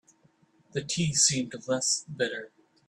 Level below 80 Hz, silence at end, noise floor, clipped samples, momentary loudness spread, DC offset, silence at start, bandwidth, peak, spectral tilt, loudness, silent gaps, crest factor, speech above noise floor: -64 dBFS; 0.4 s; -65 dBFS; under 0.1%; 14 LU; under 0.1%; 0.75 s; 13 kHz; -10 dBFS; -2.5 dB/octave; -27 LUFS; none; 20 dB; 36 dB